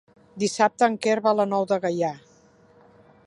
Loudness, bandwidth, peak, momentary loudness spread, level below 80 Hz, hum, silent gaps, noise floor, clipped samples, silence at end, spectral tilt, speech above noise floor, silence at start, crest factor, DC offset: -23 LUFS; 11.5 kHz; -6 dBFS; 8 LU; -72 dBFS; none; none; -56 dBFS; under 0.1%; 1.1 s; -4.5 dB/octave; 33 dB; 0.35 s; 20 dB; under 0.1%